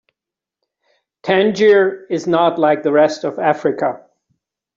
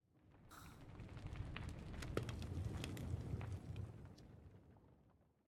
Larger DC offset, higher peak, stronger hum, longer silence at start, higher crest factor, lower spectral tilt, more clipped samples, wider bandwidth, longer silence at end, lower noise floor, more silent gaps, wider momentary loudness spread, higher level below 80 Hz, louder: neither; first, -2 dBFS vs -26 dBFS; neither; first, 1.25 s vs 0.15 s; second, 14 dB vs 24 dB; about the same, -5.5 dB/octave vs -6 dB/octave; neither; second, 7.6 kHz vs 17 kHz; first, 0.8 s vs 0.25 s; first, -86 dBFS vs -73 dBFS; neither; second, 10 LU vs 17 LU; about the same, -62 dBFS vs -58 dBFS; first, -15 LUFS vs -50 LUFS